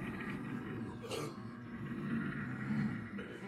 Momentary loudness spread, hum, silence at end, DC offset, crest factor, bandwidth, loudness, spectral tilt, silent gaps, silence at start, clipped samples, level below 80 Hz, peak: 8 LU; none; 0 s; under 0.1%; 16 dB; 14.5 kHz; -42 LUFS; -6.5 dB/octave; none; 0 s; under 0.1%; -64 dBFS; -26 dBFS